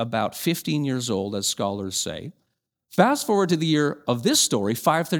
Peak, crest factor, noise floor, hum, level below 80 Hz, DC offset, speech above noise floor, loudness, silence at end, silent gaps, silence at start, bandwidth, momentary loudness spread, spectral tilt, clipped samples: -2 dBFS; 22 dB; -76 dBFS; none; -64 dBFS; under 0.1%; 53 dB; -23 LUFS; 0 s; none; 0 s; over 20 kHz; 8 LU; -4 dB/octave; under 0.1%